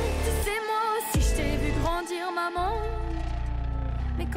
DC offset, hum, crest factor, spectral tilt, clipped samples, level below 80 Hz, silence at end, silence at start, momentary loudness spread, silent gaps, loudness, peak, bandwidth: under 0.1%; none; 12 dB; -5 dB/octave; under 0.1%; -30 dBFS; 0 s; 0 s; 6 LU; none; -29 LUFS; -16 dBFS; 16 kHz